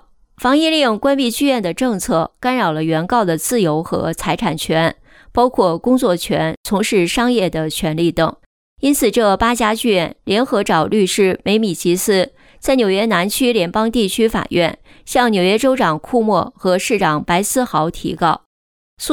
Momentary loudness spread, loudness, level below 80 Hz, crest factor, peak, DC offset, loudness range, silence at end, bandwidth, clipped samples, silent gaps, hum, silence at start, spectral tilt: 5 LU; -16 LUFS; -42 dBFS; 14 dB; -2 dBFS; under 0.1%; 2 LU; 0 s; over 20 kHz; under 0.1%; 6.57-6.64 s, 8.46-8.76 s, 18.46-18.97 s; none; 0.4 s; -4.5 dB/octave